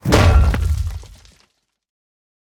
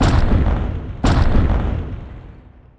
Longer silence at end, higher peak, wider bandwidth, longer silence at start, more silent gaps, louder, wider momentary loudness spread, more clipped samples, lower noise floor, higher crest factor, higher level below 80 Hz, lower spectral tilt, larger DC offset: first, 1.45 s vs 0.4 s; about the same, 0 dBFS vs -2 dBFS; first, 17.5 kHz vs 9.4 kHz; about the same, 0.05 s vs 0 s; neither; about the same, -17 LUFS vs -19 LUFS; about the same, 16 LU vs 17 LU; neither; first, -62 dBFS vs -42 dBFS; about the same, 18 dB vs 14 dB; about the same, -22 dBFS vs -20 dBFS; about the same, -6 dB/octave vs -7 dB/octave; neither